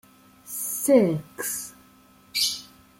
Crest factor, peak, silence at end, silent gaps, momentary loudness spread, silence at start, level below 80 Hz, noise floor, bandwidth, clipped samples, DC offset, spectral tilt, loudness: 22 dB; -6 dBFS; 0.35 s; none; 16 LU; 0.45 s; -66 dBFS; -55 dBFS; 16.5 kHz; under 0.1%; under 0.1%; -3.5 dB/octave; -25 LUFS